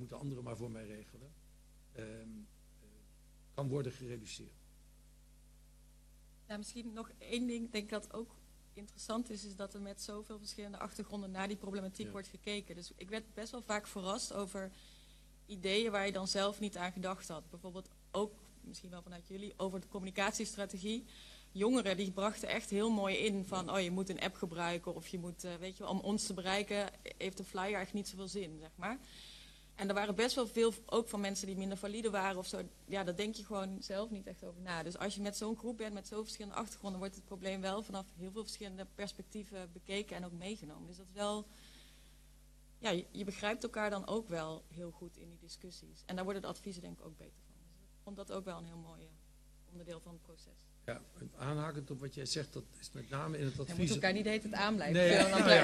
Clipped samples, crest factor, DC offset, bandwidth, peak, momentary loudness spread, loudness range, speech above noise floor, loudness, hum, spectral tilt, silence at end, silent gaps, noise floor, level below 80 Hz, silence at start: under 0.1%; 32 dB; under 0.1%; 13.5 kHz; -8 dBFS; 18 LU; 10 LU; 22 dB; -39 LUFS; none; -4.5 dB/octave; 0 s; none; -62 dBFS; -62 dBFS; 0 s